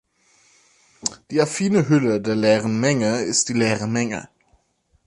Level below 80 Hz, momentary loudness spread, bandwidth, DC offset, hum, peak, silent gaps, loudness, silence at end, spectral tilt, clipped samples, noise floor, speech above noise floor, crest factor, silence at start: -58 dBFS; 10 LU; 11.5 kHz; under 0.1%; none; -4 dBFS; none; -20 LUFS; 0.8 s; -4.5 dB/octave; under 0.1%; -64 dBFS; 45 dB; 18 dB; 1.05 s